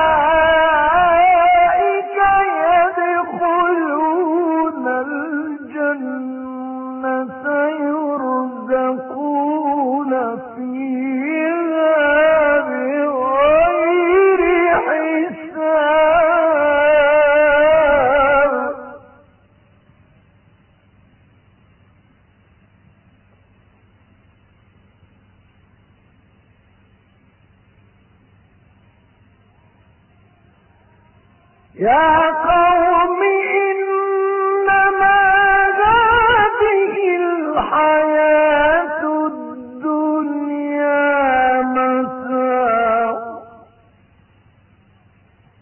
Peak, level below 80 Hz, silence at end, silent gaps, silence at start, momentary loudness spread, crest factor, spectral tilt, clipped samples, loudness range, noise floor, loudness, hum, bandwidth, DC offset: -4 dBFS; -46 dBFS; 2.15 s; none; 0 s; 10 LU; 14 dB; -9.5 dB/octave; under 0.1%; 8 LU; -53 dBFS; -15 LUFS; none; 3.2 kHz; under 0.1%